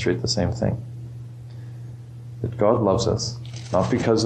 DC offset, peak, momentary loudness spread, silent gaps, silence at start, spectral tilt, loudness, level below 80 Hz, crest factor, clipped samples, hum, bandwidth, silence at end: under 0.1%; -6 dBFS; 18 LU; none; 0 s; -5.5 dB/octave; -23 LUFS; -46 dBFS; 18 dB; under 0.1%; none; 9.2 kHz; 0 s